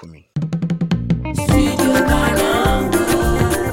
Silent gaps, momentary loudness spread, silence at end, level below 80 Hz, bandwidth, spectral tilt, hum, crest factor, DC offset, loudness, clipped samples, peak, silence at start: none; 7 LU; 0 s; -26 dBFS; 17 kHz; -5.5 dB/octave; none; 14 dB; under 0.1%; -17 LUFS; under 0.1%; -2 dBFS; 0 s